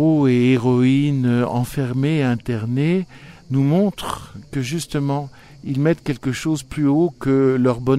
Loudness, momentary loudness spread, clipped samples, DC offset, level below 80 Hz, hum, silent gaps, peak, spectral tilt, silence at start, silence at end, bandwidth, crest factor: -19 LUFS; 11 LU; under 0.1%; under 0.1%; -46 dBFS; none; none; -4 dBFS; -7.5 dB/octave; 0 s; 0 s; 14.5 kHz; 14 dB